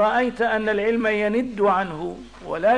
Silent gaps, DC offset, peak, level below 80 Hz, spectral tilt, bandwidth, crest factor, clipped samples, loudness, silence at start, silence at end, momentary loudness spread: none; 0.3%; -10 dBFS; -52 dBFS; -6 dB/octave; 10 kHz; 12 dB; under 0.1%; -22 LUFS; 0 s; 0 s; 11 LU